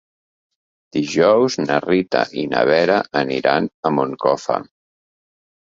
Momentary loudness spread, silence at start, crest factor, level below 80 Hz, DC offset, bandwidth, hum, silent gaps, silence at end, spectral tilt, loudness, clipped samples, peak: 7 LU; 0.95 s; 18 dB; -60 dBFS; under 0.1%; 7.8 kHz; none; 3.74-3.83 s; 0.95 s; -5 dB/octave; -18 LUFS; under 0.1%; -2 dBFS